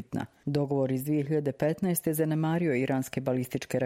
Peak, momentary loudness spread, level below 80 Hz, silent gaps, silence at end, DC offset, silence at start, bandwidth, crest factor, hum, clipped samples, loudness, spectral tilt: -12 dBFS; 4 LU; -64 dBFS; none; 0 s; under 0.1%; 0 s; 16.5 kHz; 16 dB; none; under 0.1%; -29 LUFS; -6.5 dB/octave